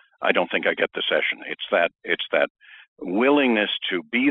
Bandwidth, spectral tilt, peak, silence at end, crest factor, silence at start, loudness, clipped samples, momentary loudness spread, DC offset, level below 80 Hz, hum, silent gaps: 4.1 kHz; -6.5 dB/octave; -2 dBFS; 0 s; 20 dB; 0.2 s; -22 LUFS; under 0.1%; 8 LU; under 0.1%; -72 dBFS; none; 2.50-2.55 s, 2.88-2.96 s